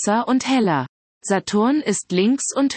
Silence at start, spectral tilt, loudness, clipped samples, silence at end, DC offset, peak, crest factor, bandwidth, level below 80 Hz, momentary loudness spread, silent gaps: 0 s; -4.5 dB/octave; -20 LUFS; under 0.1%; 0 s; under 0.1%; -6 dBFS; 12 dB; 8.8 kHz; -64 dBFS; 6 LU; 0.89-1.21 s